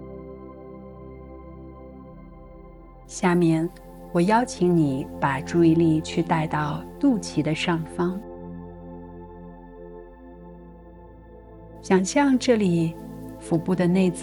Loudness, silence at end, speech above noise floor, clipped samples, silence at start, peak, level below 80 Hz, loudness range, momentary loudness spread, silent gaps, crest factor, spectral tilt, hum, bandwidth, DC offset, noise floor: -23 LUFS; 0 s; 24 dB; under 0.1%; 0 s; -6 dBFS; -48 dBFS; 17 LU; 23 LU; none; 18 dB; -6.5 dB/octave; none; 12 kHz; under 0.1%; -45 dBFS